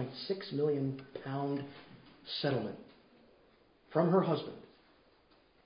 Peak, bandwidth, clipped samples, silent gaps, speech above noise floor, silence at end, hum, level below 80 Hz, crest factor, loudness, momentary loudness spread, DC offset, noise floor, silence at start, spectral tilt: -16 dBFS; 5.2 kHz; under 0.1%; none; 32 dB; 1 s; none; -74 dBFS; 22 dB; -35 LUFS; 22 LU; under 0.1%; -67 dBFS; 0 s; -5.5 dB/octave